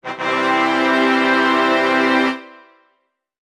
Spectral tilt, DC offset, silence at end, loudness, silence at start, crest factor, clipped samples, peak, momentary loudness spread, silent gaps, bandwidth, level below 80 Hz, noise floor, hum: -4 dB/octave; under 0.1%; 0.95 s; -16 LUFS; 0.05 s; 16 dB; under 0.1%; -2 dBFS; 6 LU; none; 12 kHz; -76 dBFS; -68 dBFS; none